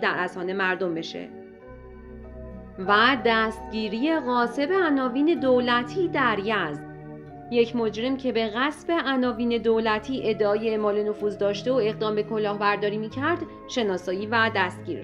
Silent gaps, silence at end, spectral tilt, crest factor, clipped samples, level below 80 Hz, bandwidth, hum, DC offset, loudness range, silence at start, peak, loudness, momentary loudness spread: none; 0 s; -5.5 dB/octave; 20 dB; under 0.1%; -52 dBFS; 11.5 kHz; none; under 0.1%; 3 LU; 0 s; -6 dBFS; -24 LUFS; 19 LU